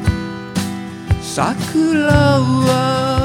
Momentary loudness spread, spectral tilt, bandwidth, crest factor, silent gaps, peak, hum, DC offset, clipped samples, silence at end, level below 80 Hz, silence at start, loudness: 11 LU; -6 dB/octave; 16.5 kHz; 16 dB; none; 0 dBFS; none; under 0.1%; under 0.1%; 0 s; -32 dBFS; 0 s; -16 LUFS